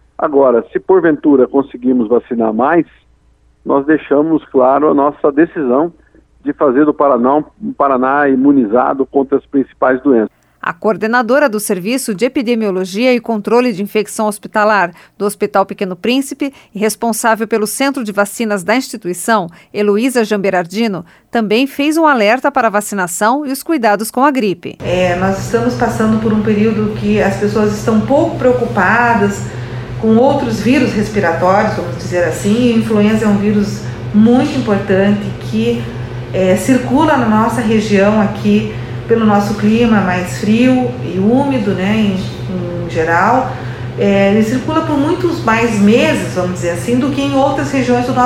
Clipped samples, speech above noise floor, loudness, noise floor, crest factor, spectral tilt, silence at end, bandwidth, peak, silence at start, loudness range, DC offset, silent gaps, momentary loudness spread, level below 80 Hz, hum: under 0.1%; 38 dB; -13 LUFS; -50 dBFS; 12 dB; -6 dB/octave; 0 s; 15.5 kHz; 0 dBFS; 0.2 s; 2 LU; under 0.1%; none; 8 LU; -40 dBFS; none